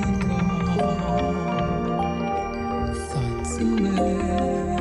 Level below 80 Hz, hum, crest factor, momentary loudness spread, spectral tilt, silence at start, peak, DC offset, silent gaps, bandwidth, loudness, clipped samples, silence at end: -36 dBFS; none; 12 dB; 5 LU; -6.5 dB/octave; 0 s; -12 dBFS; under 0.1%; none; 11.5 kHz; -24 LUFS; under 0.1%; 0 s